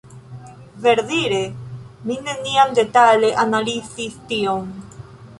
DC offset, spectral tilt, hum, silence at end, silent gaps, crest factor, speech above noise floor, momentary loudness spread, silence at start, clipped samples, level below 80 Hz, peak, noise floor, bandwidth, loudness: under 0.1%; -4 dB/octave; none; 0.05 s; none; 18 dB; 21 dB; 23 LU; 0.05 s; under 0.1%; -54 dBFS; -2 dBFS; -39 dBFS; 11.5 kHz; -18 LUFS